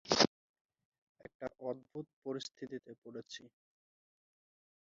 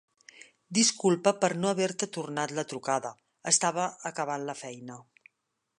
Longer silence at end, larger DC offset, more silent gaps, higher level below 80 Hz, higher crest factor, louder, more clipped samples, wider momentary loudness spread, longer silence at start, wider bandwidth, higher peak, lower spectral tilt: first, 1.35 s vs 0.8 s; neither; first, 0.27-0.54 s, 0.61-0.69 s, 0.85-0.92 s, 0.98-1.15 s, 1.35-1.40 s, 2.13-2.22 s, 2.98-3.02 s vs none; about the same, -74 dBFS vs -78 dBFS; first, 30 dB vs 22 dB; second, -39 LUFS vs -28 LUFS; neither; first, 20 LU vs 16 LU; second, 0.05 s vs 0.4 s; second, 7.4 kHz vs 11.5 kHz; second, -12 dBFS vs -8 dBFS; about the same, -2 dB/octave vs -3 dB/octave